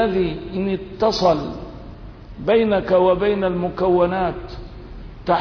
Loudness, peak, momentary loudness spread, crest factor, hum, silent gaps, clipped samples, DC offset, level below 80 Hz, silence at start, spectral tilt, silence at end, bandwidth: -19 LUFS; -6 dBFS; 22 LU; 14 dB; none; none; under 0.1%; under 0.1%; -38 dBFS; 0 s; -7 dB/octave; 0 s; 5.4 kHz